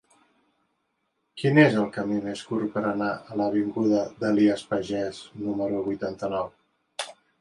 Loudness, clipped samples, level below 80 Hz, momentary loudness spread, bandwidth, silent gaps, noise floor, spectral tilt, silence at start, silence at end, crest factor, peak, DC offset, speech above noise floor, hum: -26 LUFS; under 0.1%; -64 dBFS; 15 LU; 11.5 kHz; none; -76 dBFS; -6.5 dB/octave; 1.35 s; 0.3 s; 22 dB; -4 dBFS; under 0.1%; 51 dB; none